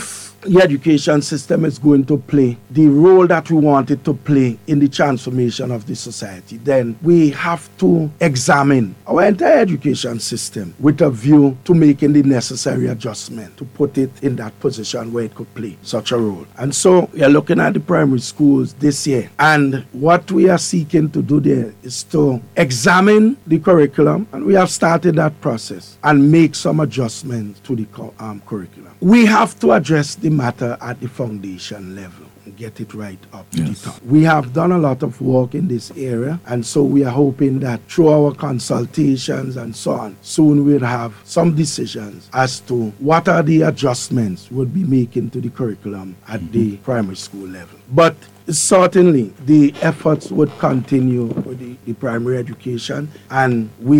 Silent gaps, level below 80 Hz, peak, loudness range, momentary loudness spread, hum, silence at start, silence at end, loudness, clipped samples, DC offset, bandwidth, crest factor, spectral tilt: none; -54 dBFS; 0 dBFS; 7 LU; 15 LU; none; 0 s; 0 s; -15 LUFS; under 0.1%; under 0.1%; 15.5 kHz; 14 dB; -6 dB/octave